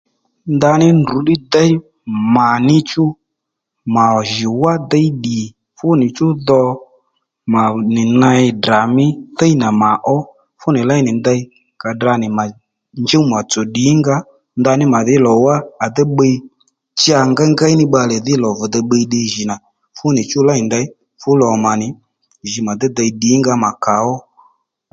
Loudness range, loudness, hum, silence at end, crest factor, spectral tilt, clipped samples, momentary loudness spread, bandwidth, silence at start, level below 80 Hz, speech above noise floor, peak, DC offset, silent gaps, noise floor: 3 LU; -14 LUFS; none; 0.7 s; 14 dB; -5.5 dB/octave; under 0.1%; 11 LU; 9 kHz; 0.45 s; -52 dBFS; 64 dB; 0 dBFS; under 0.1%; none; -77 dBFS